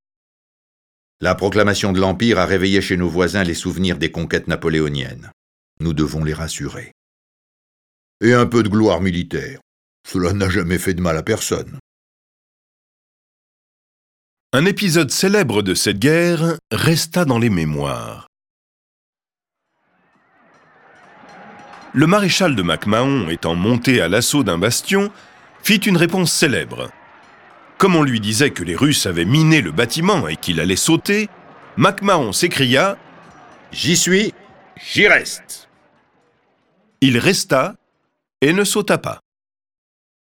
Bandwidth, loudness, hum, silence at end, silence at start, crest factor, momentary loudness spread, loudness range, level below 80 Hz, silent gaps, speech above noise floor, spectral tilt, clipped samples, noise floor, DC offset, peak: 19 kHz; -17 LUFS; none; 1.2 s; 1.2 s; 18 dB; 11 LU; 7 LU; -44 dBFS; 5.33-5.77 s, 6.92-8.20 s, 9.62-10.04 s, 11.80-14.50 s, 18.27-18.33 s, 18.50-19.13 s; 69 dB; -4.5 dB/octave; under 0.1%; -86 dBFS; under 0.1%; 0 dBFS